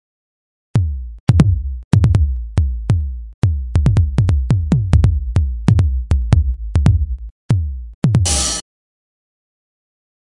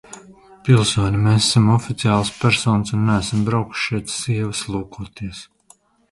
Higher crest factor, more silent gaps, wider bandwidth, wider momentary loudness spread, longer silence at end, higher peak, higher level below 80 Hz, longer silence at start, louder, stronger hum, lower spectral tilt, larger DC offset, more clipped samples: about the same, 16 dB vs 18 dB; first, 1.20-1.27 s, 1.84-1.91 s, 3.34-3.42 s, 7.31-7.49 s, 7.94-8.02 s vs none; about the same, 11.5 kHz vs 11.5 kHz; second, 7 LU vs 16 LU; first, 1.65 s vs 0.7 s; about the same, 0 dBFS vs 0 dBFS; first, -22 dBFS vs -42 dBFS; first, 0.75 s vs 0.1 s; about the same, -17 LUFS vs -18 LUFS; neither; about the same, -6 dB/octave vs -5 dB/octave; first, 0.2% vs under 0.1%; neither